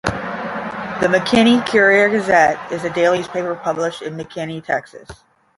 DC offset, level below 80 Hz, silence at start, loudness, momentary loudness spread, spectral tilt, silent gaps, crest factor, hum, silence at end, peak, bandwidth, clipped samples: under 0.1%; -48 dBFS; 0.05 s; -17 LUFS; 13 LU; -5 dB/octave; none; 16 dB; none; 0.45 s; -2 dBFS; 11.5 kHz; under 0.1%